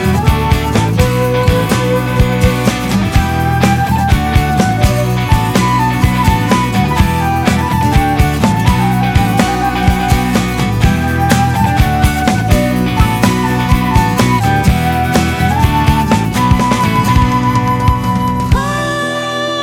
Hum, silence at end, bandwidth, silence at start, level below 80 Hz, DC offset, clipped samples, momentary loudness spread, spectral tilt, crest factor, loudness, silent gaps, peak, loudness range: none; 0 s; 18 kHz; 0 s; -20 dBFS; under 0.1%; under 0.1%; 2 LU; -6 dB/octave; 12 dB; -12 LUFS; none; 0 dBFS; 1 LU